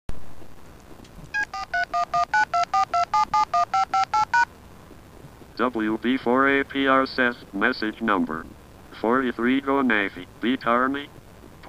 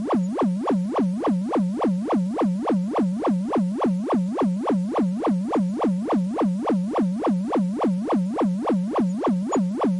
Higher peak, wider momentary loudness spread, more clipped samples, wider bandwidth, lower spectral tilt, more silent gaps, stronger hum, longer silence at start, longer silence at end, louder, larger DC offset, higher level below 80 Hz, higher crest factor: first, -6 dBFS vs -14 dBFS; first, 9 LU vs 2 LU; neither; first, 15.5 kHz vs 11 kHz; second, -4.5 dB/octave vs -8.5 dB/octave; neither; neither; about the same, 0.1 s vs 0 s; about the same, 0 s vs 0 s; about the same, -23 LUFS vs -23 LUFS; neither; first, -50 dBFS vs -62 dBFS; first, 18 dB vs 10 dB